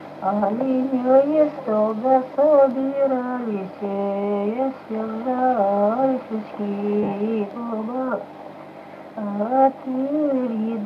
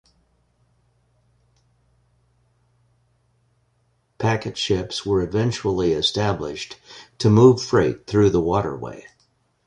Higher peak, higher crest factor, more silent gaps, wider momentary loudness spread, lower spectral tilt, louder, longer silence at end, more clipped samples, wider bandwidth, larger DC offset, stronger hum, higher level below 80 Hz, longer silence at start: about the same, -4 dBFS vs -2 dBFS; second, 16 dB vs 22 dB; neither; second, 12 LU vs 19 LU; first, -9.5 dB/octave vs -6 dB/octave; about the same, -22 LUFS vs -20 LUFS; second, 0 s vs 0.65 s; neither; second, 5.6 kHz vs 10.5 kHz; neither; neither; second, -68 dBFS vs -46 dBFS; second, 0 s vs 4.2 s